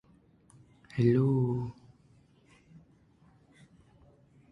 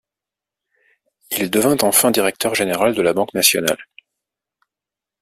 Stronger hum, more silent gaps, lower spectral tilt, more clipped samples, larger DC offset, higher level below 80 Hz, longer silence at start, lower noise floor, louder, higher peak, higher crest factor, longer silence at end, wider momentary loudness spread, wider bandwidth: neither; neither; first, -10 dB/octave vs -2.5 dB/octave; neither; neither; about the same, -62 dBFS vs -58 dBFS; second, 0.95 s vs 1.3 s; second, -63 dBFS vs -87 dBFS; second, -29 LUFS vs -16 LUFS; second, -14 dBFS vs 0 dBFS; about the same, 20 dB vs 20 dB; first, 2.8 s vs 1.4 s; first, 16 LU vs 9 LU; second, 6 kHz vs 16 kHz